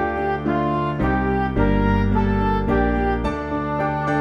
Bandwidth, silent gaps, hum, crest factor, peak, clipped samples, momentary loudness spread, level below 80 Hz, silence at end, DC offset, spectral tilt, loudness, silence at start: 7 kHz; none; none; 14 dB; -6 dBFS; under 0.1%; 4 LU; -28 dBFS; 0 s; under 0.1%; -9 dB/octave; -21 LUFS; 0 s